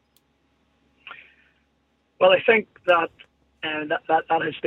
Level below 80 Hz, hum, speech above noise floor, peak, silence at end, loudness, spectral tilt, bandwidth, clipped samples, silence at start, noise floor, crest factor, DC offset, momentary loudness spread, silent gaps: -70 dBFS; none; 47 dB; -4 dBFS; 0 s; -21 LUFS; -6 dB/octave; 4.1 kHz; under 0.1%; 1.05 s; -68 dBFS; 20 dB; under 0.1%; 21 LU; none